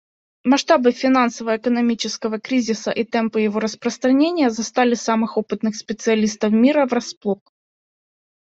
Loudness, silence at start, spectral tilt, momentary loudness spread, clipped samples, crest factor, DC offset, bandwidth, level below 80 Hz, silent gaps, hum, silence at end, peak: -19 LUFS; 0.45 s; -4.5 dB/octave; 9 LU; under 0.1%; 18 dB; under 0.1%; 8 kHz; -64 dBFS; 7.17-7.21 s; none; 1.15 s; -2 dBFS